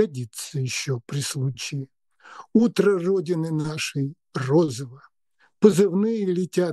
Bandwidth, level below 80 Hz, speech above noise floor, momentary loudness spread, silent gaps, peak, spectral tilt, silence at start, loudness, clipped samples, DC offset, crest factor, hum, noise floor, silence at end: 12.5 kHz; -68 dBFS; 43 dB; 12 LU; none; -2 dBFS; -6 dB/octave; 0 s; -23 LUFS; under 0.1%; under 0.1%; 22 dB; none; -65 dBFS; 0 s